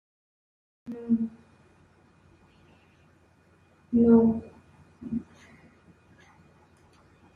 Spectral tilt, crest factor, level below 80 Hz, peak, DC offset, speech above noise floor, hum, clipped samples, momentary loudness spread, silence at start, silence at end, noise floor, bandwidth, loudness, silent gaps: -10.5 dB/octave; 22 dB; -64 dBFS; -8 dBFS; under 0.1%; 39 dB; none; under 0.1%; 23 LU; 0.85 s; 2.15 s; -61 dBFS; 3 kHz; -25 LUFS; none